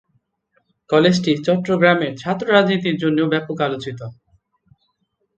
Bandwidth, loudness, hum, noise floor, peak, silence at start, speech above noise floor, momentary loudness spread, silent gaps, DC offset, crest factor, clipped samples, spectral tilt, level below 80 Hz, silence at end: 8.6 kHz; -18 LUFS; none; -70 dBFS; 0 dBFS; 0.9 s; 52 dB; 11 LU; none; under 0.1%; 20 dB; under 0.1%; -6 dB/octave; -60 dBFS; 1.25 s